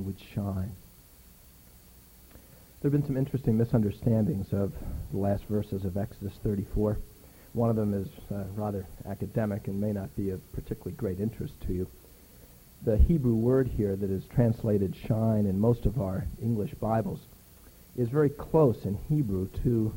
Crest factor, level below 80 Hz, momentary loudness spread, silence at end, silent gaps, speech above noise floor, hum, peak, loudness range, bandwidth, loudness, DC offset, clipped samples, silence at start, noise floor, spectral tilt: 18 dB; -40 dBFS; 12 LU; 0 s; none; 26 dB; none; -12 dBFS; 6 LU; 17 kHz; -30 LUFS; under 0.1%; under 0.1%; 0 s; -54 dBFS; -9.5 dB/octave